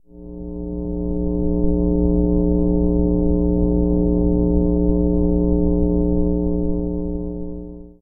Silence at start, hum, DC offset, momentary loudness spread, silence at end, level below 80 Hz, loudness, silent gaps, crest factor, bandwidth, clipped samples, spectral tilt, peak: 0.15 s; none; under 0.1%; 11 LU; 0.15 s; -24 dBFS; -20 LUFS; none; 14 dB; 1.2 kHz; under 0.1%; -17.5 dB/octave; -4 dBFS